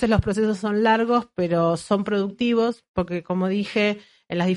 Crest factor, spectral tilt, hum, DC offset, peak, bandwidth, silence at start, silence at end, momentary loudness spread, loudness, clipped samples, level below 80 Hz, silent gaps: 16 dB; -6.5 dB/octave; none; under 0.1%; -6 dBFS; 11.5 kHz; 0 s; 0 s; 7 LU; -23 LUFS; under 0.1%; -44 dBFS; 2.88-2.94 s